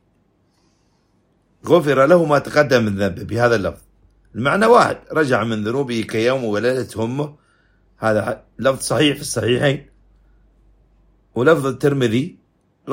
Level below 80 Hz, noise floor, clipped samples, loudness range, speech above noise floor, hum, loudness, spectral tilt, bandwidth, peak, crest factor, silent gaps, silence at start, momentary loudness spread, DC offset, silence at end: -52 dBFS; -61 dBFS; under 0.1%; 4 LU; 44 dB; none; -18 LUFS; -5.5 dB/octave; 16 kHz; 0 dBFS; 18 dB; none; 1.65 s; 11 LU; under 0.1%; 0 s